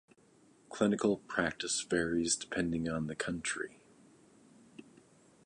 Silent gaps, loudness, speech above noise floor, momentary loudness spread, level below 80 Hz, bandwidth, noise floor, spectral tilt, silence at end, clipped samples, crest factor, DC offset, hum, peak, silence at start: none; -34 LUFS; 31 dB; 6 LU; -62 dBFS; 11.5 kHz; -65 dBFS; -3.5 dB/octave; 0.65 s; under 0.1%; 20 dB; under 0.1%; none; -16 dBFS; 0.7 s